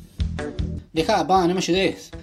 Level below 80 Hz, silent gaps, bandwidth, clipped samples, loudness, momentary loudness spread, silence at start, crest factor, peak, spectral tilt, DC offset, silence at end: -36 dBFS; none; 15 kHz; under 0.1%; -22 LUFS; 10 LU; 0 s; 18 dB; -4 dBFS; -5 dB/octave; under 0.1%; 0 s